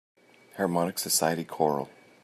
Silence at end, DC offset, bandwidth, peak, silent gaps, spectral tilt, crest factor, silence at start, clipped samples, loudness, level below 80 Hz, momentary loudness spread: 0.35 s; under 0.1%; 14.5 kHz; -10 dBFS; none; -3.5 dB/octave; 20 dB; 0.55 s; under 0.1%; -27 LUFS; -74 dBFS; 12 LU